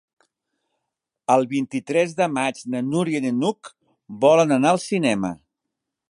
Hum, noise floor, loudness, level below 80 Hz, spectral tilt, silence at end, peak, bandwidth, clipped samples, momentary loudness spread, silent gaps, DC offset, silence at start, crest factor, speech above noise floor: none; -82 dBFS; -21 LUFS; -66 dBFS; -5.5 dB/octave; 0.75 s; -4 dBFS; 11.5 kHz; under 0.1%; 13 LU; none; under 0.1%; 1.3 s; 20 dB; 62 dB